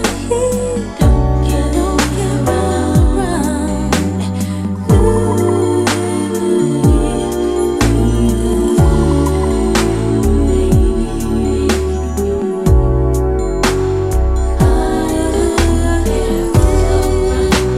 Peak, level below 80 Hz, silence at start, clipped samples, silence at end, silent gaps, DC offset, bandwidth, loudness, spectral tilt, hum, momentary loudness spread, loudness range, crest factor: 0 dBFS; -18 dBFS; 0 s; under 0.1%; 0 s; none; under 0.1%; 15 kHz; -14 LUFS; -6 dB/octave; none; 5 LU; 2 LU; 12 dB